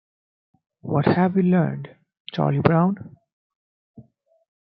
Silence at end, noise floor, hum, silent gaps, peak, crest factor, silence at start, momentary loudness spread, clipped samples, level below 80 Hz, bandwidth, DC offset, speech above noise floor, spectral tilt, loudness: 0.65 s; -51 dBFS; none; 2.20-2.25 s, 3.33-3.94 s; -2 dBFS; 22 dB; 0.85 s; 19 LU; under 0.1%; -58 dBFS; 5.4 kHz; under 0.1%; 31 dB; -11 dB/octave; -21 LUFS